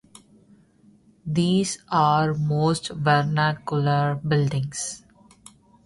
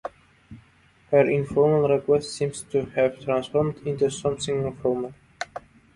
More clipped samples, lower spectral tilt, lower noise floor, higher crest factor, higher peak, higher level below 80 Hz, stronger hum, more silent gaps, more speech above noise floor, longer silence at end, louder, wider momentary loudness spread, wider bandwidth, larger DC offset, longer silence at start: neither; about the same, -5.5 dB/octave vs -6 dB/octave; about the same, -56 dBFS vs -58 dBFS; about the same, 18 dB vs 20 dB; about the same, -6 dBFS vs -4 dBFS; about the same, -56 dBFS vs -56 dBFS; neither; neither; about the same, 34 dB vs 35 dB; first, 0.9 s vs 0.35 s; about the same, -23 LUFS vs -24 LUFS; second, 9 LU vs 16 LU; about the same, 11.5 kHz vs 11.5 kHz; neither; first, 1.25 s vs 0.05 s